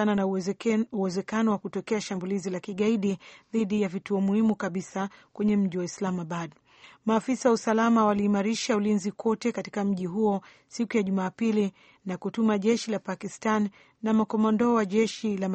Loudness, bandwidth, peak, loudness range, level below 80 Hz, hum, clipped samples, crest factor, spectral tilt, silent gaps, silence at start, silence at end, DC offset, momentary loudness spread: -27 LUFS; 8.4 kHz; -10 dBFS; 3 LU; -66 dBFS; none; under 0.1%; 16 dB; -6 dB/octave; none; 0 s; 0 s; under 0.1%; 10 LU